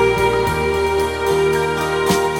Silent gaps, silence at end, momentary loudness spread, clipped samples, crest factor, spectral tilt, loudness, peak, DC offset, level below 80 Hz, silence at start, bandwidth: none; 0 s; 2 LU; under 0.1%; 14 dB; -4.5 dB/octave; -17 LUFS; -4 dBFS; under 0.1%; -34 dBFS; 0 s; 17 kHz